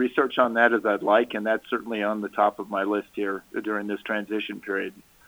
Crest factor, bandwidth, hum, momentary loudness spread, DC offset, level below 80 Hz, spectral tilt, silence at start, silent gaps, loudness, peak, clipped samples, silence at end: 20 dB; over 20 kHz; none; 10 LU; under 0.1%; -68 dBFS; -5.5 dB/octave; 0 s; none; -25 LUFS; -6 dBFS; under 0.1%; 0.25 s